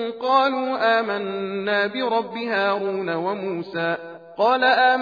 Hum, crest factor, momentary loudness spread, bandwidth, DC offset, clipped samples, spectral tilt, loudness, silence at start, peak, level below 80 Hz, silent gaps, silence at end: none; 16 dB; 9 LU; 5 kHz; under 0.1%; under 0.1%; -6 dB/octave; -22 LUFS; 0 s; -6 dBFS; -78 dBFS; none; 0 s